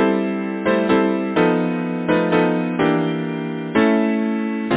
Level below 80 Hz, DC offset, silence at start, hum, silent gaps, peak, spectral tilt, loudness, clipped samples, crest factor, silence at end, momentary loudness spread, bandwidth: -54 dBFS; under 0.1%; 0 s; none; none; -4 dBFS; -11 dB/octave; -19 LUFS; under 0.1%; 16 dB; 0 s; 6 LU; 4 kHz